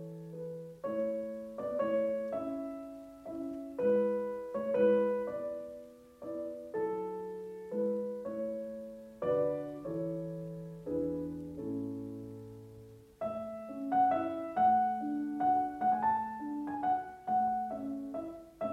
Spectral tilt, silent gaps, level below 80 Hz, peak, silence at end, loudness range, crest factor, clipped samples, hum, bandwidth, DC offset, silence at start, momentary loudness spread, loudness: -8.5 dB/octave; none; -68 dBFS; -18 dBFS; 0 s; 7 LU; 18 dB; under 0.1%; none; 14 kHz; under 0.1%; 0 s; 15 LU; -35 LUFS